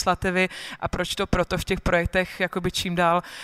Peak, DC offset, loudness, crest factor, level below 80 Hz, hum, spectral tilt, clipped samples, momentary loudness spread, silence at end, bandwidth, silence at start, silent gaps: -8 dBFS; under 0.1%; -24 LUFS; 18 dB; -38 dBFS; none; -4.5 dB/octave; under 0.1%; 5 LU; 0 s; 16 kHz; 0 s; none